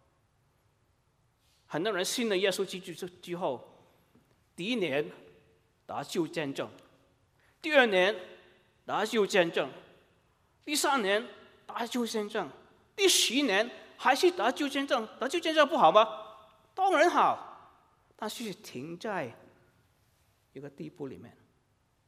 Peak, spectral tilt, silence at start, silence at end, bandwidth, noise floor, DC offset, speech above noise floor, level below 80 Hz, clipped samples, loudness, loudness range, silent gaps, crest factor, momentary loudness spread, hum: -8 dBFS; -2.5 dB/octave; 1.7 s; 0.8 s; 15.5 kHz; -71 dBFS; under 0.1%; 42 dB; -78 dBFS; under 0.1%; -29 LUFS; 10 LU; none; 24 dB; 19 LU; none